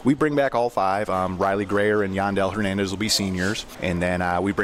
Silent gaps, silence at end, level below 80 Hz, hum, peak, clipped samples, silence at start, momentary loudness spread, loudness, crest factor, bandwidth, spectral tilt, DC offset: none; 0 s; -48 dBFS; none; -8 dBFS; under 0.1%; 0 s; 4 LU; -23 LUFS; 14 dB; 16 kHz; -5 dB/octave; under 0.1%